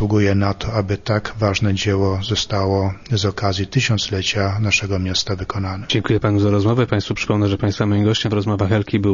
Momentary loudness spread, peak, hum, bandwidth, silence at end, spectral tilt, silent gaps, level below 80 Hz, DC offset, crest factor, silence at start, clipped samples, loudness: 5 LU; -4 dBFS; none; 7.4 kHz; 0 s; -5.5 dB/octave; none; -42 dBFS; under 0.1%; 16 dB; 0 s; under 0.1%; -19 LUFS